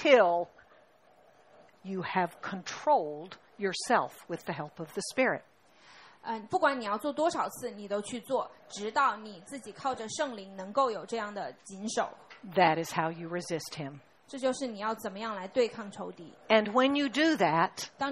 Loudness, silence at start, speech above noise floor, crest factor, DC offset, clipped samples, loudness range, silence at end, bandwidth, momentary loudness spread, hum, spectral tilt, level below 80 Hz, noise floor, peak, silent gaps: -31 LUFS; 0 s; 31 dB; 24 dB; under 0.1%; under 0.1%; 5 LU; 0 s; 14 kHz; 15 LU; none; -4 dB/octave; -74 dBFS; -62 dBFS; -8 dBFS; none